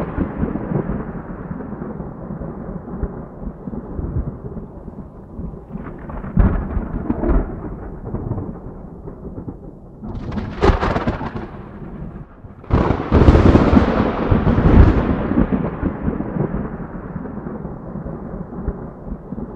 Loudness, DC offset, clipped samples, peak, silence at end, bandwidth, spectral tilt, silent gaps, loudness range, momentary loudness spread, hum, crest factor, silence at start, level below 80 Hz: -20 LUFS; under 0.1%; under 0.1%; 0 dBFS; 0 s; 7.4 kHz; -9.5 dB/octave; none; 14 LU; 20 LU; none; 20 dB; 0 s; -24 dBFS